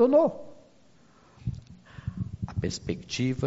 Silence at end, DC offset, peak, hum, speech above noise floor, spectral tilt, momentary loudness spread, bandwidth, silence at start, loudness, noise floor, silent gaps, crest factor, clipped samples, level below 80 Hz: 0 s; under 0.1%; -10 dBFS; none; 34 dB; -6.5 dB/octave; 21 LU; 7.6 kHz; 0 s; -30 LUFS; -60 dBFS; none; 18 dB; under 0.1%; -50 dBFS